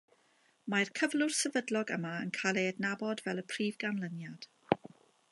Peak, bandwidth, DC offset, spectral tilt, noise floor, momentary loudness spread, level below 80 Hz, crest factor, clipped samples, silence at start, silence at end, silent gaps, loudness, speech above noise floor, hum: -8 dBFS; 11.5 kHz; under 0.1%; -4 dB/octave; -70 dBFS; 10 LU; -80 dBFS; 28 dB; under 0.1%; 0.65 s; 0.45 s; none; -34 LUFS; 36 dB; none